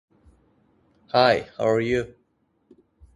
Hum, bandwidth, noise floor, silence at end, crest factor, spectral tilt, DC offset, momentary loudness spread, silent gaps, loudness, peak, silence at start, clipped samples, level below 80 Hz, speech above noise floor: none; 11.5 kHz; -68 dBFS; 1.1 s; 22 dB; -5.5 dB/octave; under 0.1%; 8 LU; none; -22 LUFS; -4 dBFS; 1.15 s; under 0.1%; -54 dBFS; 47 dB